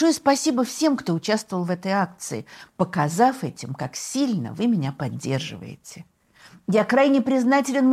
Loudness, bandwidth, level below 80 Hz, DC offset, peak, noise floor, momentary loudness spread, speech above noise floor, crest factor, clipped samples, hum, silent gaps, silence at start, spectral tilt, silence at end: -23 LUFS; 15 kHz; -66 dBFS; under 0.1%; -6 dBFS; -51 dBFS; 15 LU; 29 dB; 18 dB; under 0.1%; none; none; 0 s; -5 dB/octave; 0 s